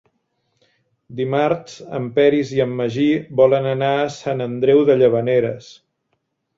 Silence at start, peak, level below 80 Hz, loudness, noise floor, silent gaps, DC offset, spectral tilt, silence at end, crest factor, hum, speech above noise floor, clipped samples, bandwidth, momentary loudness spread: 1.1 s; -2 dBFS; -58 dBFS; -18 LUFS; -71 dBFS; none; under 0.1%; -7 dB/octave; 0.85 s; 16 dB; none; 54 dB; under 0.1%; 7.6 kHz; 11 LU